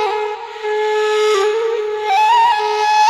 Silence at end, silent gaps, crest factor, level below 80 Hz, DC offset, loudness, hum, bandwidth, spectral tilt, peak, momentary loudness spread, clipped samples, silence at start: 0 s; none; 12 dB; -62 dBFS; under 0.1%; -16 LUFS; none; 13.5 kHz; -0.5 dB/octave; -4 dBFS; 10 LU; under 0.1%; 0 s